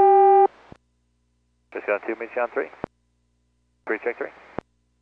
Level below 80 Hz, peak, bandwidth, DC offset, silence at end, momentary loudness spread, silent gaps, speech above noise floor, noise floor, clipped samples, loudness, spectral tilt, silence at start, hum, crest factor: -64 dBFS; -8 dBFS; 4.1 kHz; under 0.1%; 0.75 s; 23 LU; none; 40 dB; -68 dBFS; under 0.1%; -22 LUFS; -8 dB/octave; 0 s; 60 Hz at -65 dBFS; 16 dB